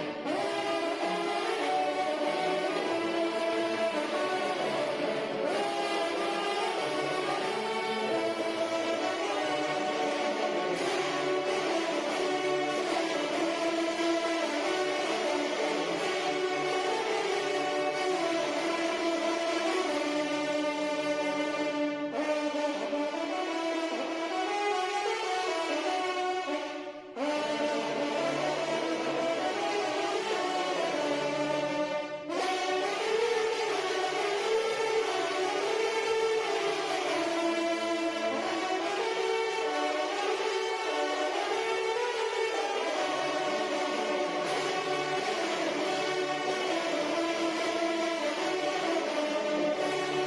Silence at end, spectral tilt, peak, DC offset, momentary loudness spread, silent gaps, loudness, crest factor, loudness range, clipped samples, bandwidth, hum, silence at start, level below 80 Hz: 0 s; -3 dB/octave; -18 dBFS; under 0.1%; 2 LU; none; -30 LUFS; 12 dB; 2 LU; under 0.1%; 12 kHz; none; 0 s; -76 dBFS